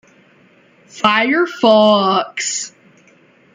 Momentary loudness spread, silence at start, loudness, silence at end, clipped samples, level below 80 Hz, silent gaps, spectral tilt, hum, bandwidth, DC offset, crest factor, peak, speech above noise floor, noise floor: 10 LU; 0.95 s; -14 LUFS; 0.85 s; under 0.1%; -64 dBFS; none; -3 dB/octave; none; 9.6 kHz; under 0.1%; 16 dB; 0 dBFS; 37 dB; -50 dBFS